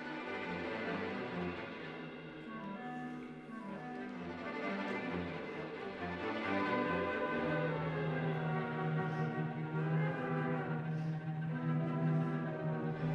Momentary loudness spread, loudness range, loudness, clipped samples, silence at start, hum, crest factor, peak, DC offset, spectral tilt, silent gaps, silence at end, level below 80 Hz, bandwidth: 10 LU; 7 LU; -39 LUFS; under 0.1%; 0 s; none; 14 dB; -24 dBFS; under 0.1%; -8.5 dB/octave; none; 0 s; -70 dBFS; 6.2 kHz